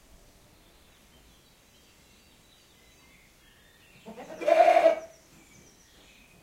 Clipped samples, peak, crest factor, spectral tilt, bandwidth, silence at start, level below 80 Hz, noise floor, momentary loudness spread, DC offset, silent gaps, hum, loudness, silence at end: under 0.1%; -8 dBFS; 22 dB; -3.5 dB/octave; 15.5 kHz; 4.05 s; -64 dBFS; -59 dBFS; 28 LU; under 0.1%; none; none; -23 LUFS; 1.35 s